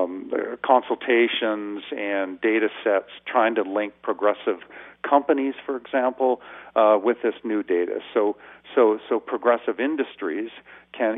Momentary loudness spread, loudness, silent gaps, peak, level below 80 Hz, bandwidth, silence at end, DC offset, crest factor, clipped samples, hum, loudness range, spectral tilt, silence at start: 10 LU; -23 LUFS; none; -4 dBFS; -72 dBFS; 3.9 kHz; 0 s; under 0.1%; 20 dB; under 0.1%; none; 2 LU; -8 dB/octave; 0 s